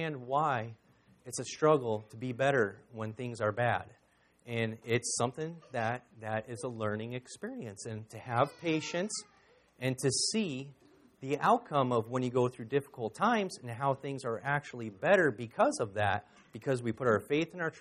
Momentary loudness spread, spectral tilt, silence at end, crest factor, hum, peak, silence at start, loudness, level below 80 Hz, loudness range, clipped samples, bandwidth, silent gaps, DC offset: 13 LU; -4.5 dB/octave; 0 s; 20 dB; none; -12 dBFS; 0 s; -33 LUFS; -72 dBFS; 5 LU; under 0.1%; 13 kHz; none; under 0.1%